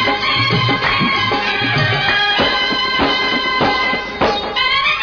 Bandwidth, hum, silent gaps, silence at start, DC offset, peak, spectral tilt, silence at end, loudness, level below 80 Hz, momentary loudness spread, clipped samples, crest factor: 5.4 kHz; none; none; 0 s; under 0.1%; -2 dBFS; -4.5 dB/octave; 0 s; -14 LUFS; -40 dBFS; 3 LU; under 0.1%; 14 dB